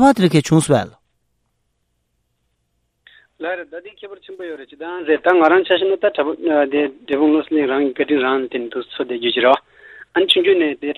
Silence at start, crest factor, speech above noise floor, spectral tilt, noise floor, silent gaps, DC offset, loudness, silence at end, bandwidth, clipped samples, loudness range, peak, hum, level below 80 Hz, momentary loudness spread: 0 s; 18 dB; 52 dB; -5.5 dB/octave; -69 dBFS; none; under 0.1%; -17 LUFS; 0.05 s; 14.5 kHz; under 0.1%; 17 LU; 0 dBFS; none; -56 dBFS; 18 LU